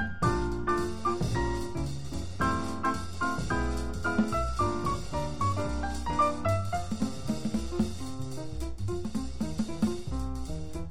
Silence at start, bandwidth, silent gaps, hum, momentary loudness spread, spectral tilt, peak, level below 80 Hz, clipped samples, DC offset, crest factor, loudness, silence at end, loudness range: 0 s; 16 kHz; none; none; 8 LU; -6 dB/octave; -14 dBFS; -40 dBFS; under 0.1%; 1%; 16 dB; -32 LUFS; 0 s; 4 LU